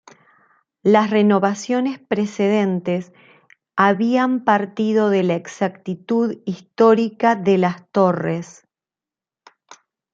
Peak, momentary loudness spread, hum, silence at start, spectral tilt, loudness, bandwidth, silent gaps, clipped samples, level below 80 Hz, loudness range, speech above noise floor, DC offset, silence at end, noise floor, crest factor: 0 dBFS; 10 LU; none; 0.85 s; -6.5 dB/octave; -19 LUFS; 7.6 kHz; none; under 0.1%; -68 dBFS; 1 LU; 72 dB; under 0.1%; 1.6 s; -90 dBFS; 20 dB